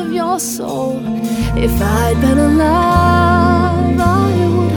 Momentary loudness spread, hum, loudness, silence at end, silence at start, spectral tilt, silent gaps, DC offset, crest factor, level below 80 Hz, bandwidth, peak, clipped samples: 8 LU; none; -13 LUFS; 0 s; 0 s; -6.5 dB/octave; none; under 0.1%; 12 dB; -24 dBFS; over 20 kHz; 0 dBFS; under 0.1%